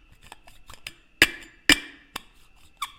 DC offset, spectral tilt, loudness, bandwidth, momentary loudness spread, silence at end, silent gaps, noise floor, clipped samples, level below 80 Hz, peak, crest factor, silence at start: under 0.1%; -1 dB/octave; -21 LUFS; 17 kHz; 22 LU; 0.1 s; none; -53 dBFS; under 0.1%; -48 dBFS; 0 dBFS; 28 dB; 0.7 s